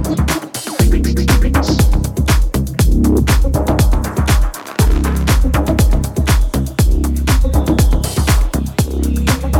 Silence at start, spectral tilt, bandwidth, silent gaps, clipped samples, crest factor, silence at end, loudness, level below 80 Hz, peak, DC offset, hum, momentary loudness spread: 0 s; -5.5 dB/octave; 17.5 kHz; none; under 0.1%; 10 dB; 0 s; -15 LUFS; -14 dBFS; -2 dBFS; under 0.1%; none; 4 LU